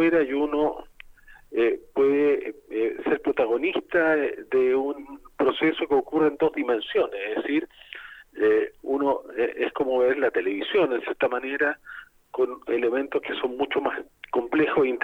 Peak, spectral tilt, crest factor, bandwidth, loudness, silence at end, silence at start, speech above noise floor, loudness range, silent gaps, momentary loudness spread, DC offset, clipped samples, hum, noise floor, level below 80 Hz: -10 dBFS; -6.5 dB/octave; 14 dB; 4.8 kHz; -25 LUFS; 0 s; 0 s; 25 dB; 2 LU; none; 10 LU; under 0.1%; under 0.1%; none; -50 dBFS; -58 dBFS